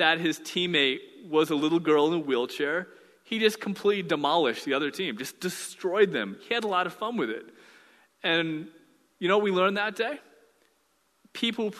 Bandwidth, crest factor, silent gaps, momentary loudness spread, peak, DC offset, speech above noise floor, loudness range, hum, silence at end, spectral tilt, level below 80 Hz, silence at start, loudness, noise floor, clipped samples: 13.5 kHz; 20 dB; none; 10 LU; -8 dBFS; under 0.1%; 43 dB; 3 LU; none; 0 s; -4 dB/octave; -76 dBFS; 0 s; -27 LUFS; -70 dBFS; under 0.1%